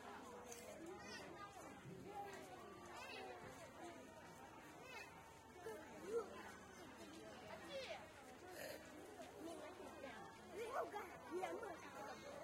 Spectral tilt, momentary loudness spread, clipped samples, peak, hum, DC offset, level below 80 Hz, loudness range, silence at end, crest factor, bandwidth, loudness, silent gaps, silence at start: -4 dB/octave; 10 LU; under 0.1%; -32 dBFS; none; under 0.1%; -80 dBFS; 4 LU; 0 s; 22 dB; 16 kHz; -54 LUFS; none; 0 s